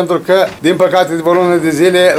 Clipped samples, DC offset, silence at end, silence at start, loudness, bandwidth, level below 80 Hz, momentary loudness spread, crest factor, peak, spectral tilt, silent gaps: under 0.1%; under 0.1%; 0 s; 0 s; -11 LUFS; 15.5 kHz; -54 dBFS; 2 LU; 10 dB; 0 dBFS; -5 dB/octave; none